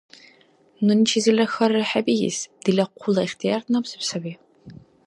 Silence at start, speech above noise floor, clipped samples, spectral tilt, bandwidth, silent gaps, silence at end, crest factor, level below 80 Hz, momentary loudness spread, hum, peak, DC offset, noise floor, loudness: 0.8 s; 35 dB; under 0.1%; -4.5 dB/octave; 11.5 kHz; none; 0.35 s; 18 dB; -68 dBFS; 9 LU; none; -6 dBFS; under 0.1%; -57 dBFS; -22 LUFS